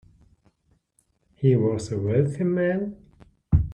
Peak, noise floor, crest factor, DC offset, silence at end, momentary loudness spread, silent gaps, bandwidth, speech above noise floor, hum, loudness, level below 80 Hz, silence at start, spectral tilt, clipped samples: -6 dBFS; -69 dBFS; 20 dB; under 0.1%; 0 s; 7 LU; none; 9.8 kHz; 46 dB; none; -24 LUFS; -38 dBFS; 1.4 s; -8.5 dB/octave; under 0.1%